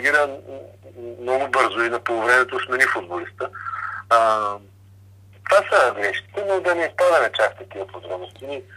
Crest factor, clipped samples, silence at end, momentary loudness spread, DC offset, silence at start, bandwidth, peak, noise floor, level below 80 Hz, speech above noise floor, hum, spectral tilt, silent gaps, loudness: 22 dB; under 0.1%; 0 s; 17 LU; under 0.1%; 0 s; 14.5 kHz; 0 dBFS; -48 dBFS; -66 dBFS; 27 dB; none; -3.5 dB/octave; none; -20 LUFS